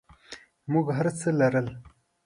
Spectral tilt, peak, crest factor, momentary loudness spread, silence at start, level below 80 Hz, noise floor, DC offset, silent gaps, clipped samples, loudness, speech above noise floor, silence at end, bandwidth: -7 dB/octave; -10 dBFS; 18 dB; 22 LU; 0.3 s; -60 dBFS; -49 dBFS; under 0.1%; none; under 0.1%; -26 LUFS; 24 dB; 0.4 s; 11.5 kHz